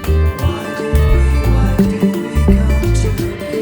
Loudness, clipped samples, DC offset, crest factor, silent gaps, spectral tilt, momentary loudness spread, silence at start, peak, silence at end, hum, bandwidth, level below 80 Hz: -15 LUFS; under 0.1%; under 0.1%; 12 dB; none; -7 dB/octave; 6 LU; 0 s; 0 dBFS; 0 s; none; over 20 kHz; -16 dBFS